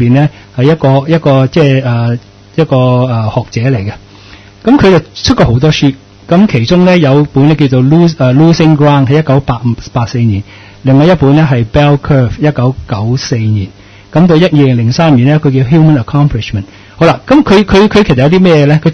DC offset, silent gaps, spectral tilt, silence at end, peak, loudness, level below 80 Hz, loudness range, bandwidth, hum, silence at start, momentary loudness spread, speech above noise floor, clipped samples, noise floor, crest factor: under 0.1%; none; -7.5 dB/octave; 0 s; 0 dBFS; -8 LUFS; -30 dBFS; 3 LU; 6.6 kHz; none; 0 s; 8 LU; 27 dB; 2%; -34 dBFS; 8 dB